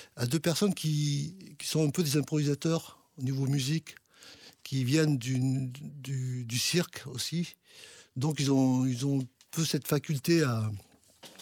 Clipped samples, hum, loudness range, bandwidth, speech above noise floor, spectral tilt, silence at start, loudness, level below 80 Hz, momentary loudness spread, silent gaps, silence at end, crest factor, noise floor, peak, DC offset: under 0.1%; none; 2 LU; 18 kHz; 26 dB; -5.5 dB/octave; 0 s; -30 LUFS; -68 dBFS; 15 LU; none; 0 s; 18 dB; -55 dBFS; -14 dBFS; under 0.1%